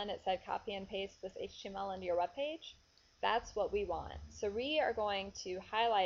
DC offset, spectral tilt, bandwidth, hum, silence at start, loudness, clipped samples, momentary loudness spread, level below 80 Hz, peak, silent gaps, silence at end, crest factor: under 0.1%; -1.5 dB/octave; 7.4 kHz; none; 0 s; -39 LUFS; under 0.1%; 11 LU; -60 dBFS; -18 dBFS; none; 0 s; 20 dB